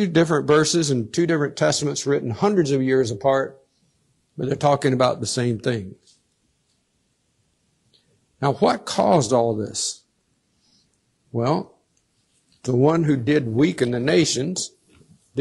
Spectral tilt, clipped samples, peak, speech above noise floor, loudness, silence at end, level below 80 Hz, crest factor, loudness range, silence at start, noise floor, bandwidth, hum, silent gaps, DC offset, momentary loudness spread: -5 dB/octave; under 0.1%; -6 dBFS; 48 dB; -21 LUFS; 0 s; -60 dBFS; 18 dB; 7 LU; 0 s; -68 dBFS; 12 kHz; none; none; under 0.1%; 11 LU